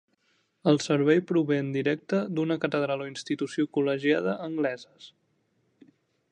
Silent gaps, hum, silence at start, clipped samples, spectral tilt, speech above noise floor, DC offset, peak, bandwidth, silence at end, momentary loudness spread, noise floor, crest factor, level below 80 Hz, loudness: none; none; 0.65 s; under 0.1%; -6 dB/octave; 45 dB; under 0.1%; -10 dBFS; 9.8 kHz; 1.25 s; 8 LU; -72 dBFS; 18 dB; -76 dBFS; -27 LUFS